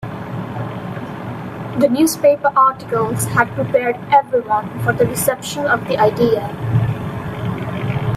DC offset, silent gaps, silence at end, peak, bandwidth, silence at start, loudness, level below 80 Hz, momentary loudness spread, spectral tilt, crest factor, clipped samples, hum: under 0.1%; none; 0 s; 0 dBFS; 16 kHz; 0 s; -18 LUFS; -46 dBFS; 13 LU; -5.5 dB/octave; 16 dB; under 0.1%; none